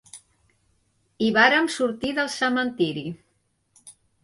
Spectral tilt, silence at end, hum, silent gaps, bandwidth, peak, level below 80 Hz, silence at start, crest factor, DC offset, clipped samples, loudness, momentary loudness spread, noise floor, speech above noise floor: -4 dB/octave; 0.35 s; none; none; 11.5 kHz; -4 dBFS; -62 dBFS; 0.15 s; 22 dB; under 0.1%; under 0.1%; -22 LUFS; 15 LU; -70 dBFS; 47 dB